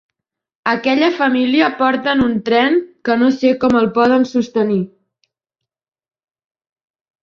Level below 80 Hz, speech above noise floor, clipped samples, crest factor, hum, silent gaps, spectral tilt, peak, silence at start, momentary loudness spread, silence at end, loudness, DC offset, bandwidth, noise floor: -52 dBFS; 68 dB; under 0.1%; 16 dB; none; none; -6 dB/octave; -2 dBFS; 0.65 s; 5 LU; 2.35 s; -15 LUFS; under 0.1%; 7 kHz; -82 dBFS